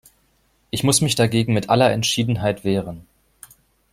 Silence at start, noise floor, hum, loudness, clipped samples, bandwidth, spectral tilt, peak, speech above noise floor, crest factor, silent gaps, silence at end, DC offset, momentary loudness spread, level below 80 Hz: 0.75 s; -63 dBFS; none; -19 LUFS; under 0.1%; 15.5 kHz; -4.5 dB/octave; -2 dBFS; 44 dB; 18 dB; none; 0.9 s; under 0.1%; 10 LU; -50 dBFS